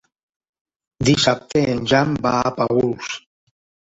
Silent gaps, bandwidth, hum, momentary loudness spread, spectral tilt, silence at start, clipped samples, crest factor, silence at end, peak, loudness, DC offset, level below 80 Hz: none; 8 kHz; none; 10 LU; -5 dB/octave; 1 s; under 0.1%; 18 dB; 0.75 s; -2 dBFS; -19 LUFS; under 0.1%; -48 dBFS